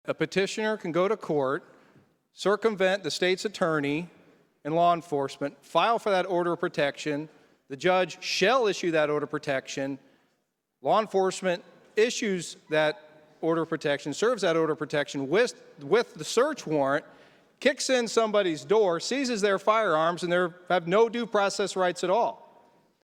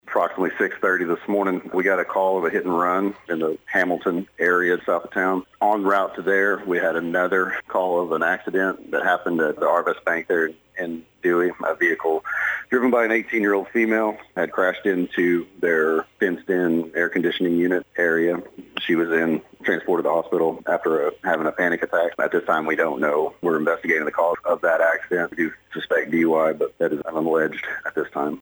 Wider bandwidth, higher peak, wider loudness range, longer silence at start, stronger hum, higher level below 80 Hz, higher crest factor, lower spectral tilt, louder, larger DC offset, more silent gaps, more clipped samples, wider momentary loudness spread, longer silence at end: second, 15 kHz vs over 20 kHz; about the same, -8 dBFS vs -6 dBFS; about the same, 3 LU vs 1 LU; about the same, 0.05 s vs 0.05 s; neither; second, -74 dBFS vs -66 dBFS; about the same, 18 dB vs 16 dB; second, -4 dB/octave vs -6 dB/octave; second, -27 LUFS vs -22 LUFS; neither; neither; neither; first, 8 LU vs 5 LU; first, 0.7 s vs 0.05 s